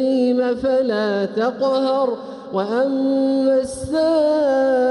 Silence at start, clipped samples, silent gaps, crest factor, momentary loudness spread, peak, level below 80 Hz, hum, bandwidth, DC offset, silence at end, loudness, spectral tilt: 0 s; under 0.1%; none; 10 dB; 6 LU; -8 dBFS; -52 dBFS; none; 11.5 kHz; under 0.1%; 0 s; -19 LUFS; -5.5 dB/octave